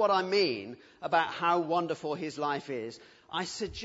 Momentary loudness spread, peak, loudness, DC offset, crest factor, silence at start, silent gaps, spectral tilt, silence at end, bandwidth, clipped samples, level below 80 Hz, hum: 13 LU; -12 dBFS; -31 LUFS; under 0.1%; 18 dB; 0 s; none; -4.5 dB/octave; 0 s; 8 kHz; under 0.1%; -64 dBFS; none